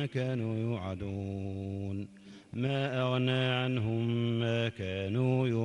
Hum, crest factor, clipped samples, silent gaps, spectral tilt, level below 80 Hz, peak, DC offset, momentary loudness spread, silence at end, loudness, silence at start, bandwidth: none; 16 dB; under 0.1%; none; -7.5 dB/octave; -64 dBFS; -16 dBFS; under 0.1%; 9 LU; 0 s; -33 LUFS; 0 s; 9.4 kHz